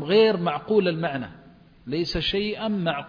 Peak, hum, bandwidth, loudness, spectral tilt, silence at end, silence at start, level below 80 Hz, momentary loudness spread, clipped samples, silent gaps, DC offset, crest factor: -8 dBFS; none; 5.2 kHz; -24 LUFS; -6.5 dB/octave; 0 s; 0 s; -48 dBFS; 13 LU; under 0.1%; none; under 0.1%; 16 dB